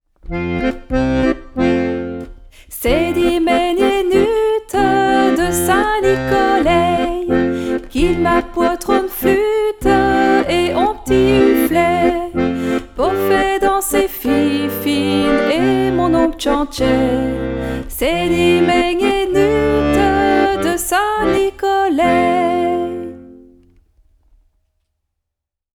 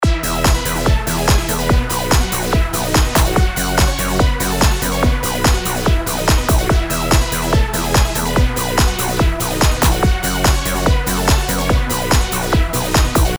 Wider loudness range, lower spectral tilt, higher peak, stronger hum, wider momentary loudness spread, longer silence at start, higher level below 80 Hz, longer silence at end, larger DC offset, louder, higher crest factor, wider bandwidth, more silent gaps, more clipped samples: first, 3 LU vs 0 LU; about the same, -5 dB/octave vs -4 dB/octave; about the same, -2 dBFS vs -2 dBFS; neither; first, 7 LU vs 2 LU; first, 0.25 s vs 0 s; second, -32 dBFS vs -18 dBFS; first, 2.4 s vs 0 s; second, under 0.1% vs 0.4%; about the same, -15 LUFS vs -16 LUFS; about the same, 14 dB vs 14 dB; about the same, 19.5 kHz vs over 20 kHz; neither; neither